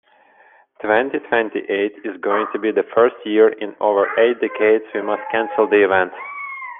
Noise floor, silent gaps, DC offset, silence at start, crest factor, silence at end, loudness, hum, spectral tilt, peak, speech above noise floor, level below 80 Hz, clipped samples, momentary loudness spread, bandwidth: -52 dBFS; none; under 0.1%; 0.85 s; 16 dB; 0 s; -18 LUFS; none; -8 dB/octave; -2 dBFS; 34 dB; -68 dBFS; under 0.1%; 9 LU; 3.8 kHz